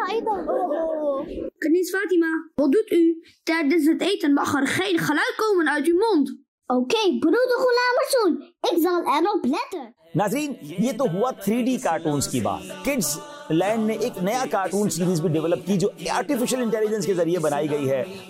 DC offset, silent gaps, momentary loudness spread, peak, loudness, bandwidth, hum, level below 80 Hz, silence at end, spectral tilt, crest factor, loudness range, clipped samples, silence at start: under 0.1%; 6.48-6.58 s; 6 LU; -10 dBFS; -23 LUFS; 16 kHz; none; -58 dBFS; 0 s; -5 dB/octave; 12 dB; 3 LU; under 0.1%; 0 s